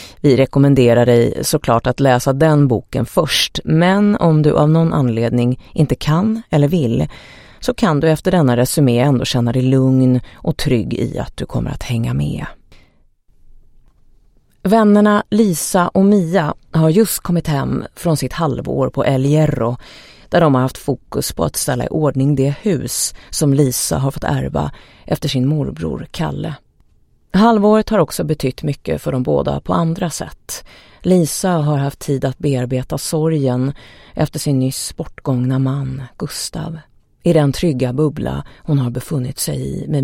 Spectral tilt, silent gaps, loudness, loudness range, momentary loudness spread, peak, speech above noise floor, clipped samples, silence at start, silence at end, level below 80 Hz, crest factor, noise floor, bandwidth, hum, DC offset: -6 dB/octave; none; -16 LUFS; 6 LU; 11 LU; 0 dBFS; 38 dB; under 0.1%; 0 s; 0 s; -38 dBFS; 16 dB; -53 dBFS; 16.5 kHz; none; under 0.1%